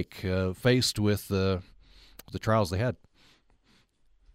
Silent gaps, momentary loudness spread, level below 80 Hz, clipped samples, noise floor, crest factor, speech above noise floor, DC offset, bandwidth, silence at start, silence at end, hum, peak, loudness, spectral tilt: none; 10 LU; -54 dBFS; under 0.1%; -65 dBFS; 20 dB; 37 dB; under 0.1%; 16 kHz; 0 s; 1.4 s; none; -10 dBFS; -28 LUFS; -5.5 dB/octave